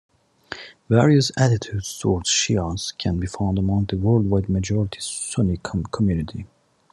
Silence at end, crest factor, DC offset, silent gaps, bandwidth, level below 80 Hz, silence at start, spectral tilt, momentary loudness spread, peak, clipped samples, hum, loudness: 0.45 s; 18 dB; under 0.1%; none; 12.5 kHz; -50 dBFS; 0.5 s; -5 dB/octave; 11 LU; -2 dBFS; under 0.1%; none; -21 LUFS